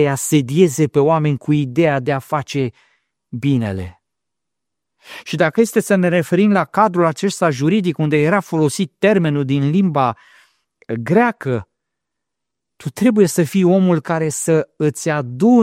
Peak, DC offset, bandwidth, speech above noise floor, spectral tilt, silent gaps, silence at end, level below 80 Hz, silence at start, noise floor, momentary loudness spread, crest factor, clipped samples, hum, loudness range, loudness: 0 dBFS; under 0.1%; 16 kHz; 67 dB; -6 dB/octave; none; 0 s; -56 dBFS; 0 s; -83 dBFS; 10 LU; 16 dB; under 0.1%; none; 6 LU; -16 LUFS